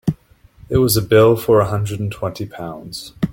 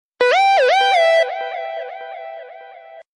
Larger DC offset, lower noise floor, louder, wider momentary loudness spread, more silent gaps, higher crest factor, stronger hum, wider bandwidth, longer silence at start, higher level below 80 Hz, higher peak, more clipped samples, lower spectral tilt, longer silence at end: neither; first, -48 dBFS vs -40 dBFS; about the same, -16 LUFS vs -15 LUFS; about the same, 18 LU vs 20 LU; neither; about the same, 16 dB vs 14 dB; neither; first, 17 kHz vs 11 kHz; second, 0.05 s vs 0.2 s; first, -40 dBFS vs -82 dBFS; about the same, -2 dBFS vs -4 dBFS; neither; first, -6 dB/octave vs 0.5 dB/octave; second, 0 s vs 0.15 s